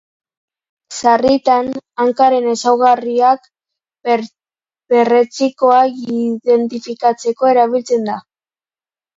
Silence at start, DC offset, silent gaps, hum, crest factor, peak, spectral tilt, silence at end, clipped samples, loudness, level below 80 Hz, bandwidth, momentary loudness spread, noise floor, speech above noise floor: 0.9 s; under 0.1%; none; none; 14 dB; 0 dBFS; -4 dB/octave; 0.95 s; under 0.1%; -14 LUFS; -58 dBFS; 7.8 kHz; 8 LU; under -90 dBFS; over 77 dB